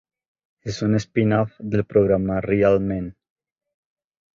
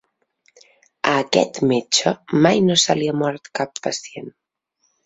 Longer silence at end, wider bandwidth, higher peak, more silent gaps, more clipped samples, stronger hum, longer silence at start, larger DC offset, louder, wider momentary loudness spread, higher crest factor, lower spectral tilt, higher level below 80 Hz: first, 1.25 s vs 0.75 s; second, 7.6 kHz vs 8.4 kHz; about the same, -4 dBFS vs -2 dBFS; neither; neither; neither; second, 0.65 s vs 1.05 s; neither; about the same, -21 LUFS vs -19 LUFS; about the same, 12 LU vs 12 LU; about the same, 18 dB vs 20 dB; first, -7.5 dB/octave vs -4 dB/octave; first, -46 dBFS vs -62 dBFS